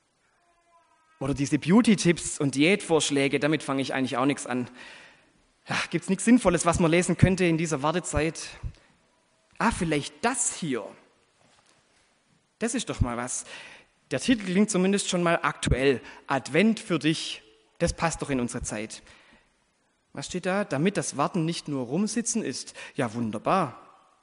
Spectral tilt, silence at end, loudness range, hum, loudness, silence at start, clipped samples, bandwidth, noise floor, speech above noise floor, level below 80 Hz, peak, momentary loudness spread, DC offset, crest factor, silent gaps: -4.5 dB/octave; 0.4 s; 7 LU; none; -26 LUFS; 1.2 s; under 0.1%; 11 kHz; -70 dBFS; 44 dB; -46 dBFS; -4 dBFS; 13 LU; under 0.1%; 24 dB; none